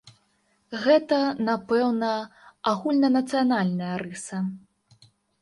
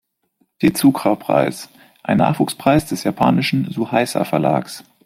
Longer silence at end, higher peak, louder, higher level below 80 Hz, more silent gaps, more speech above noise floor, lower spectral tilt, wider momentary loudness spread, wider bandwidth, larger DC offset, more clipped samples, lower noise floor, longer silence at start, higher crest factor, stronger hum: first, 0.85 s vs 0.25 s; second, -8 dBFS vs -2 dBFS; second, -24 LUFS vs -18 LUFS; second, -70 dBFS vs -50 dBFS; neither; second, 44 dB vs 48 dB; about the same, -6 dB/octave vs -6 dB/octave; first, 12 LU vs 8 LU; second, 11.5 kHz vs 16 kHz; neither; neither; about the same, -68 dBFS vs -65 dBFS; second, 0.05 s vs 0.6 s; about the same, 18 dB vs 16 dB; neither